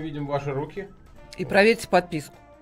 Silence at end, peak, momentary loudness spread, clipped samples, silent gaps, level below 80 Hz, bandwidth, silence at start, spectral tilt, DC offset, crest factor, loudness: 0.35 s; -4 dBFS; 24 LU; under 0.1%; none; -52 dBFS; 16 kHz; 0 s; -5.5 dB/octave; under 0.1%; 22 dB; -23 LUFS